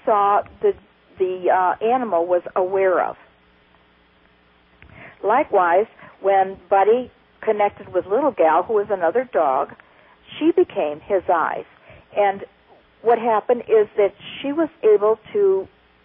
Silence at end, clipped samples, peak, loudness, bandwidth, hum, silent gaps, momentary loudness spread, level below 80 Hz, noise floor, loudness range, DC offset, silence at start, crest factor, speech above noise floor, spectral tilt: 0.4 s; under 0.1%; -6 dBFS; -20 LUFS; 3.7 kHz; none; none; 10 LU; -60 dBFS; -56 dBFS; 4 LU; under 0.1%; 0.05 s; 14 dB; 37 dB; -10 dB/octave